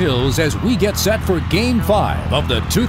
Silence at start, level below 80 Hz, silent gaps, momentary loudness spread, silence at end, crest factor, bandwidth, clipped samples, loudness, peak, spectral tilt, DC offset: 0 s; -28 dBFS; none; 2 LU; 0 s; 14 dB; 16.5 kHz; under 0.1%; -17 LUFS; -2 dBFS; -5 dB/octave; under 0.1%